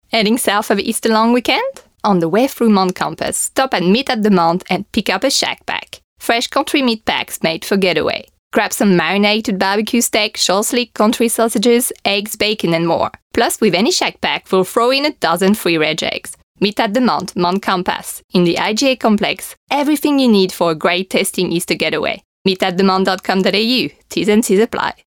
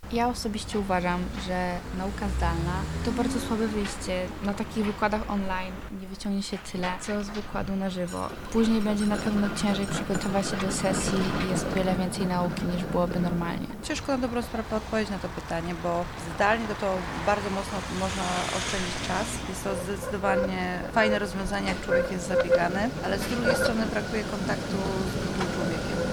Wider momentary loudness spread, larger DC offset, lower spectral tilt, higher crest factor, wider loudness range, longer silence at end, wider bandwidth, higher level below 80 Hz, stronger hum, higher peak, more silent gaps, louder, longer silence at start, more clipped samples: about the same, 6 LU vs 7 LU; neither; about the same, -4 dB/octave vs -5 dB/octave; about the same, 14 dB vs 18 dB; about the same, 2 LU vs 4 LU; first, 0.15 s vs 0 s; about the same, 20 kHz vs 19.5 kHz; second, -52 dBFS vs -40 dBFS; neither; first, -2 dBFS vs -10 dBFS; first, 6.04-6.16 s, 8.39-8.51 s, 13.22-13.30 s, 16.43-16.55 s, 18.24-18.29 s, 19.57-19.67 s, 22.25-22.45 s vs none; first, -15 LUFS vs -28 LUFS; first, 0.15 s vs 0 s; neither